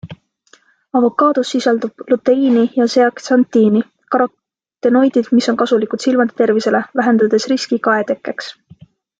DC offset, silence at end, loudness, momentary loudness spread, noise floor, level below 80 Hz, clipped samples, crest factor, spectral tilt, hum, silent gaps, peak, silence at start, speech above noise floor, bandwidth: under 0.1%; 0.7 s; -15 LUFS; 7 LU; -52 dBFS; -62 dBFS; under 0.1%; 14 dB; -5 dB/octave; none; none; -2 dBFS; 0.05 s; 38 dB; 7.8 kHz